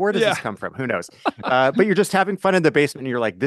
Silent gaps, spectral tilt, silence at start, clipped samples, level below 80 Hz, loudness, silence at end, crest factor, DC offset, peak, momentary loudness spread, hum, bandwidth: none; -5 dB/octave; 0 s; under 0.1%; -62 dBFS; -20 LUFS; 0 s; 18 dB; under 0.1%; -2 dBFS; 9 LU; none; 12.5 kHz